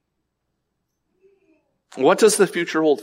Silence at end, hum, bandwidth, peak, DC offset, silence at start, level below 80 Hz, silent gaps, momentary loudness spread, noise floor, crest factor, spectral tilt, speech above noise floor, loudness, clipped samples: 0 s; none; 16 kHz; -4 dBFS; under 0.1%; 1.95 s; -76 dBFS; none; 5 LU; -76 dBFS; 18 dB; -3.5 dB/octave; 58 dB; -18 LUFS; under 0.1%